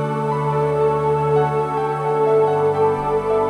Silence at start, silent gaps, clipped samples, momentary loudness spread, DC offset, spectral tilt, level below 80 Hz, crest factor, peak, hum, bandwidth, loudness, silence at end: 0 s; none; under 0.1%; 5 LU; under 0.1%; -8 dB/octave; -46 dBFS; 12 dB; -6 dBFS; none; 10.5 kHz; -19 LUFS; 0 s